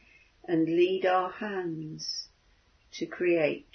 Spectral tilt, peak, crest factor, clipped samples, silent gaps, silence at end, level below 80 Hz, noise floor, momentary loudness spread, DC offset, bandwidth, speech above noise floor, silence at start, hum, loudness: -5 dB/octave; -12 dBFS; 18 dB; under 0.1%; none; 0.1 s; -68 dBFS; -65 dBFS; 15 LU; under 0.1%; 6.6 kHz; 36 dB; 0.5 s; none; -29 LUFS